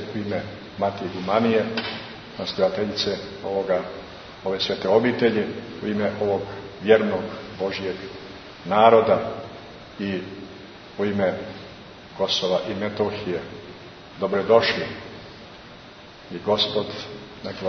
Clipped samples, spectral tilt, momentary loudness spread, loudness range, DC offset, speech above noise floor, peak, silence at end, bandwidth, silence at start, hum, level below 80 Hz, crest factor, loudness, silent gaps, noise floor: under 0.1%; -5.5 dB/octave; 21 LU; 5 LU; under 0.1%; 21 dB; -2 dBFS; 0 s; 6.4 kHz; 0 s; none; -56 dBFS; 22 dB; -23 LUFS; none; -44 dBFS